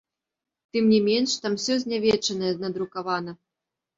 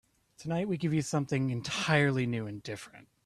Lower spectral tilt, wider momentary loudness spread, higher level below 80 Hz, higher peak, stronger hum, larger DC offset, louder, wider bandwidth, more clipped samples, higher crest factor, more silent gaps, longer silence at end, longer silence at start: second, -4 dB/octave vs -5.5 dB/octave; second, 10 LU vs 16 LU; about the same, -64 dBFS vs -66 dBFS; about the same, -8 dBFS vs -10 dBFS; neither; neither; first, -24 LUFS vs -31 LUFS; second, 7.8 kHz vs 13 kHz; neither; second, 16 dB vs 22 dB; neither; first, 0.65 s vs 0.25 s; first, 0.75 s vs 0.4 s